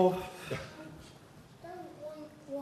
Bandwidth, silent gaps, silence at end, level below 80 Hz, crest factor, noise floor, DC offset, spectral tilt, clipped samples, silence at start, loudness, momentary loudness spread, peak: 13.5 kHz; none; 0 s; -64 dBFS; 24 dB; -55 dBFS; under 0.1%; -6.5 dB/octave; under 0.1%; 0 s; -40 LUFS; 14 LU; -14 dBFS